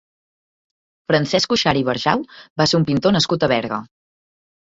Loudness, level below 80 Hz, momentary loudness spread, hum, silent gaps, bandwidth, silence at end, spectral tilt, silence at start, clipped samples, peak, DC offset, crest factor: -18 LUFS; -52 dBFS; 11 LU; none; 2.50-2.56 s; 8 kHz; 0.85 s; -5 dB/octave; 1.1 s; under 0.1%; -2 dBFS; under 0.1%; 18 dB